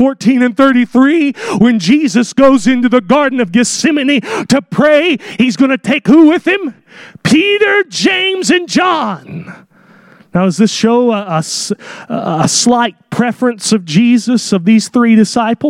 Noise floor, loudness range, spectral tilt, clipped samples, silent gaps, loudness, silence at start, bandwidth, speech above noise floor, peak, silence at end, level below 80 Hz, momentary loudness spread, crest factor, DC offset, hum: -43 dBFS; 4 LU; -4.5 dB/octave; under 0.1%; none; -11 LUFS; 0 s; 12.5 kHz; 32 dB; 0 dBFS; 0 s; -52 dBFS; 7 LU; 10 dB; under 0.1%; none